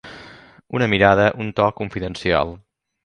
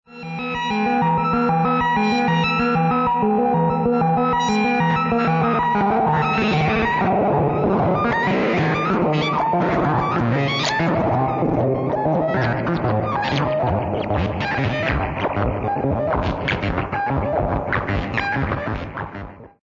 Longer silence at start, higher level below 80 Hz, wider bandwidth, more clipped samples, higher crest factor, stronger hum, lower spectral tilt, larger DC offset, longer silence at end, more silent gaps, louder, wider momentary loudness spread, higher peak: about the same, 0.05 s vs 0.1 s; second, -44 dBFS vs -38 dBFS; first, 10.5 kHz vs 7.6 kHz; neither; first, 20 dB vs 14 dB; neither; about the same, -6.5 dB/octave vs -7 dB/octave; neither; first, 0.5 s vs 0.15 s; neither; about the same, -19 LUFS vs -20 LUFS; first, 14 LU vs 4 LU; first, 0 dBFS vs -6 dBFS